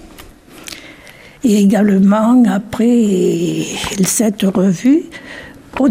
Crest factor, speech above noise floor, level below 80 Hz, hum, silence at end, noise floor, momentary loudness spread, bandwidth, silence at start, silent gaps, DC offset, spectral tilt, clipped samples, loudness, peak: 12 dB; 27 dB; -46 dBFS; none; 0 s; -39 dBFS; 20 LU; 15.5 kHz; 0.05 s; none; under 0.1%; -5.5 dB/octave; under 0.1%; -13 LUFS; -2 dBFS